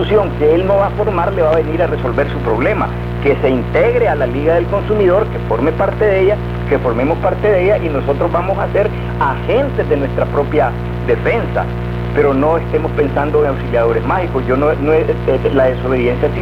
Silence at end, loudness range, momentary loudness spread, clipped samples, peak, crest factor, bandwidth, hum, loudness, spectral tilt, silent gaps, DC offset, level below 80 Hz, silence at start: 0 s; 2 LU; 5 LU; under 0.1%; 0 dBFS; 14 dB; 6 kHz; 60 Hz at -20 dBFS; -15 LUFS; -9 dB/octave; none; 0.9%; -26 dBFS; 0 s